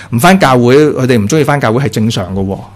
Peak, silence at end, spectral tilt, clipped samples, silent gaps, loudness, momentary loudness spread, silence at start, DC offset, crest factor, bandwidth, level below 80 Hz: 0 dBFS; 0.1 s; -6 dB/octave; 0.7%; none; -9 LUFS; 9 LU; 0 s; under 0.1%; 10 dB; 15 kHz; -36 dBFS